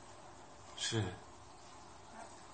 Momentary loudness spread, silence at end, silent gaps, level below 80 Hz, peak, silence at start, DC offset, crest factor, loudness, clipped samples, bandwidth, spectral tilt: 18 LU; 0 s; none; -68 dBFS; -24 dBFS; 0 s; under 0.1%; 22 dB; -42 LUFS; under 0.1%; 8.4 kHz; -3.5 dB/octave